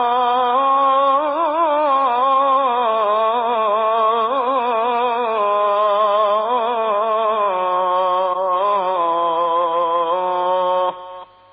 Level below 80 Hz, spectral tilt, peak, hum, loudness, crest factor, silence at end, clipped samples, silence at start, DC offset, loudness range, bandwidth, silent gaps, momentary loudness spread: -72 dBFS; -6.5 dB/octave; -6 dBFS; none; -17 LUFS; 12 dB; 0.3 s; under 0.1%; 0 s; under 0.1%; 2 LU; 5 kHz; none; 3 LU